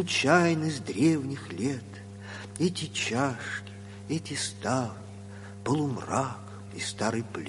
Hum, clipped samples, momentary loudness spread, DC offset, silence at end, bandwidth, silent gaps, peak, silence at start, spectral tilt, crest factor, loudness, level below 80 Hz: none; under 0.1%; 19 LU; under 0.1%; 0 s; 11.5 kHz; none; -8 dBFS; 0 s; -4.5 dB/octave; 22 dB; -29 LUFS; -58 dBFS